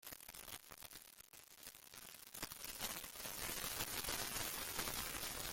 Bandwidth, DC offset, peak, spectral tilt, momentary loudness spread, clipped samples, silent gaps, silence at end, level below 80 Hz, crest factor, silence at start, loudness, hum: 17 kHz; under 0.1%; -24 dBFS; -1 dB/octave; 14 LU; under 0.1%; none; 0 s; -64 dBFS; 24 dB; 0.05 s; -45 LUFS; none